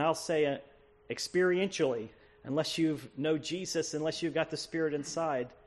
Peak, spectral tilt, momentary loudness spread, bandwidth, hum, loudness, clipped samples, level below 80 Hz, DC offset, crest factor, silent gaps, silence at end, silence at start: -16 dBFS; -4.5 dB/octave; 9 LU; 12.5 kHz; none; -33 LUFS; under 0.1%; -68 dBFS; under 0.1%; 18 dB; none; 0.1 s; 0 s